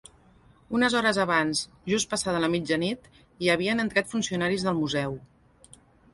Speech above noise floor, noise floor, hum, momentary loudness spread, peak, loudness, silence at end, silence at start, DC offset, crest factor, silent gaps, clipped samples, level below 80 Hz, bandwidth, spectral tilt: 31 dB; -57 dBFS; none; 8 LU; -8 dBFS; -26 LUFS; 0.9 s; 0.7 s; under 0.1%; 20 dB; none; under 0.1%; -58 dBFS; 11.5 kHz; -4 dB/octave